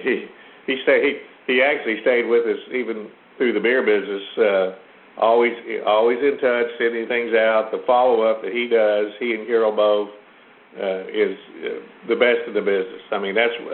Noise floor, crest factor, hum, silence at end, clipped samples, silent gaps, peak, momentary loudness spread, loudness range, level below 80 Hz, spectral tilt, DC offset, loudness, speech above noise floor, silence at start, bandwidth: -49 dBFS; 18 dB; none; 0 s; under 0.1%; none; -2 dBFS; 10 LU; 3 LU; -68 dBFS; -9 dB/octave; under 0.1%; -20 LUFS; 30 dB; 0 s; 4.3 kHz